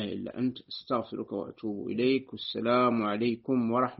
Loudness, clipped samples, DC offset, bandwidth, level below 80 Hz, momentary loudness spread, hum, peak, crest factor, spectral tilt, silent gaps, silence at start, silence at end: -30 LUFS; under 0.1%; under 0.1%; 5.8 kHz; -70 dBFS; 11 LU; none; -14 dBFS; 16 dB; -4.5 dB/octave; none; 0 s; 0.05 s